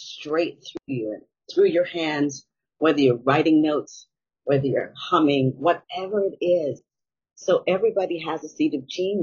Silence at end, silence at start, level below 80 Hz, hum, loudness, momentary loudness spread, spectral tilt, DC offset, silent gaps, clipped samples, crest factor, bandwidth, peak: 0 s; 0 s; -68 dBFS; none; -23 LUFS; 12 LU; -5 dB/octave; under 0.1%; none; under 0.1%; 18 dB; 7.2 kHz; -4 dBFS